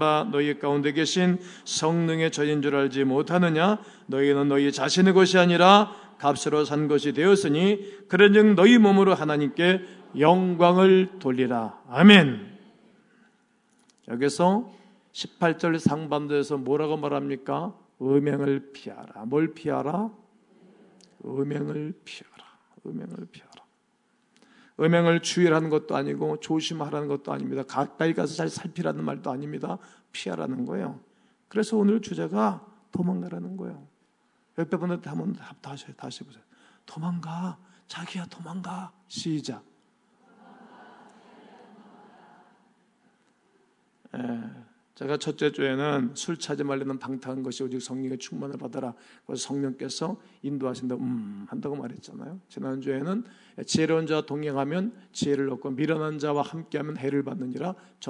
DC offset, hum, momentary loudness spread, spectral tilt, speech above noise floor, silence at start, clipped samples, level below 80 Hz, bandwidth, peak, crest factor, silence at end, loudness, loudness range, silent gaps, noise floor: under 0.1%; none; 20 LU; -5.5 dB/octave; 44 dB; 0 s; under 0.1%; -76 dBFS; 11 kHz; 0 dBFS; 26 dB; 0 s; -24 LUFS; 16 LU; none; -69 dBFS